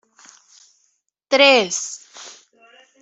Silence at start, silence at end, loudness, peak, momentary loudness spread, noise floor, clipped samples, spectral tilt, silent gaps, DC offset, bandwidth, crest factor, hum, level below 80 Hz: 1.3 s; 0.7 s; -16 LUFS; -2 dBFS; 26 LU; -68 dBFS; under 0.1%; -1 dB/octave; none; under 0.1%; 8.2 kHz; 20 dB; none; -74 dBFS